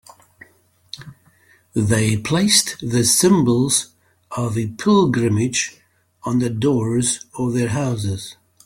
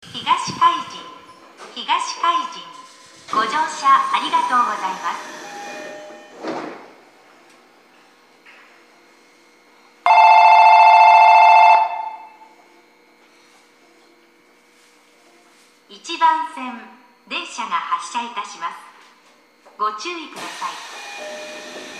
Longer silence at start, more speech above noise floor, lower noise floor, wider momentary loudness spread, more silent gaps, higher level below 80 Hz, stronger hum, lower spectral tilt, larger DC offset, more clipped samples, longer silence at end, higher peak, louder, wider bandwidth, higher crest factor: first, 0.95 s vs 0.15 s; first, 38 dB vs 32 dB; about the same, -56 dBFS vs -54 dBFS; second, 17 LU vs 24 LU; neither; first, -52 dBFS vs -76 dBFS; second, none vs 60 Hz at -65 dBFS; first, -4.5 dB/octave vs -1.5 dB/octave; neither; neither; first, 0.3 s vs 0 s; about the same, -2 dBFS vs 0 dBFS; second, -18 LUFS vs -15 LUFS; first, 17 kHz vs 11.5 kHz; about the same, 18 dB vs 18 dB